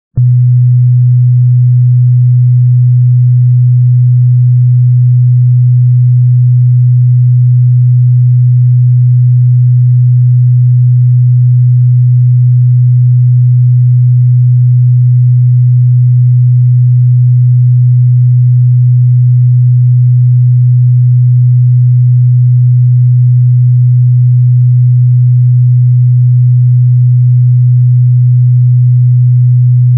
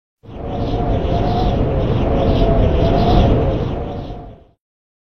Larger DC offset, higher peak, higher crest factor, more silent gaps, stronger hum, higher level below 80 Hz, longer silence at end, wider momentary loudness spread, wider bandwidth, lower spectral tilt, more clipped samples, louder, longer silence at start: second, under 0.1% vs 3%; about the same, -2 dBFS vs 0 dBFS; second, 4 dB vs 16 dB; neither; neither; second, -48 dBFS vs -22 dBFS; second, 0 s vs 0.5 s; second, 0 LU vs 15 LU; second, 0.3 kHz vs 6.2 kHz; first, -18.5 dB/octave vs -9 dB/octave; neither; first, -7 LUFS vs -17 LUFS; about the same, 0.15 s vs 0.15 s